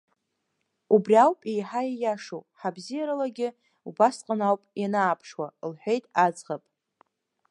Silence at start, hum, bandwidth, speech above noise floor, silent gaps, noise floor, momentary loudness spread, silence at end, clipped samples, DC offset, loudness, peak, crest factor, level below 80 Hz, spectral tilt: 0.9 s; none; 11 kHz; 53 dB; none; -78 dBFS; 17 LU; 0.95 s; under 0.1%; under 0.1%; -26 LUFS; -6 dBFS; 20 dB; -84 dBFS; -6 dB/octave